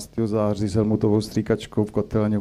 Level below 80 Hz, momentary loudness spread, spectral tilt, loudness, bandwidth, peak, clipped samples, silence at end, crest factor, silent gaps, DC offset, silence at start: -46 dBFS; 3 LU; -7.5 dB/octave; -23 LUFS; 14 kHz; -8 dBFS; under 0.1%; 0 s; 14 dB; none; under 0.1%; 0 s